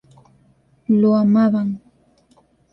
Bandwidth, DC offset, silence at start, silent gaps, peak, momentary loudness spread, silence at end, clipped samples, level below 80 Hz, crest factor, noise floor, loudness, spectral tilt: 5.6 kHz; under 0.1%; 0.9 s; none; -6 dBFS; 17 LU; 0.95 s; under 0.1%; -62 dBFS; 14 dB; -57 dBFS; -17 LUFS; -10.5 dB/octave